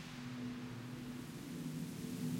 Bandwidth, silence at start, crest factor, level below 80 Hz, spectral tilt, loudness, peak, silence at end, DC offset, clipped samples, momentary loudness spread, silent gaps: 16.5 kHz; 0 s; 16 dB; -68 dBFS; -5.5 dB/octave; -46 LUFS; -30 dBFS; 0 s; under 0.1%; under 0.1%; 3 LU; none